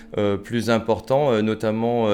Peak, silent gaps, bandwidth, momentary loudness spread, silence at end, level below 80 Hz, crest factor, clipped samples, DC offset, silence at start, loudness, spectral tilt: -6 dBFS; none; 14 kHz; 4 LU; 0 s; -52 dBFS; 16 dB; under 0.1%; under 0.1%; 0 s; -22 LUFS; -6.5 dB/octave